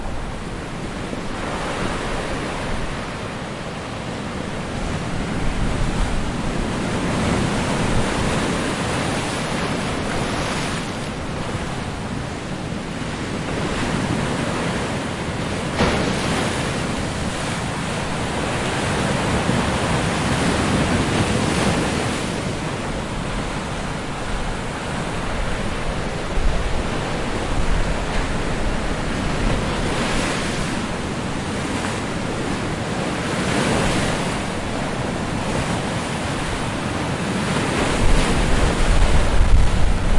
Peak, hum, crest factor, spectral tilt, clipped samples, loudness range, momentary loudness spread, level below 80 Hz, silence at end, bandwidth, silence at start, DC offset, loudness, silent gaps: -4 dBFS; none; 18 dB; -5 dB/octave; under 0.1%; 6 LU; 8 LU; -28 dBFS; 0 s; 11.5 kHz; 0 s; under 0.1%; -23 LUFS; none